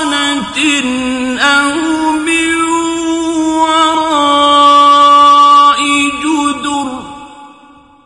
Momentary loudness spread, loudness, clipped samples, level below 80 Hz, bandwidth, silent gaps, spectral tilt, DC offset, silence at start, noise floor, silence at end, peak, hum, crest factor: 11 LU; -9 LUFS; under 0.1%; -46 dBFS; 11.5 kHz; none; -2 dB/octave; under 0.1%; 0 s; -41 dBFS; 0.55 s; 0 dBFS; none; 10 dB